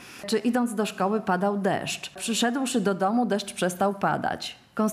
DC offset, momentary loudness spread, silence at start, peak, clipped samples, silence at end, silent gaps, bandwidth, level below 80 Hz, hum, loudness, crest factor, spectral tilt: under 0.1%; 5 LU; 0 s; -12 dBFS; under 0.1%; 0 s; none; 14.5 kHz; -68 dBFS; none; -26 LUFS; 14 dB; -4.5 dB/octave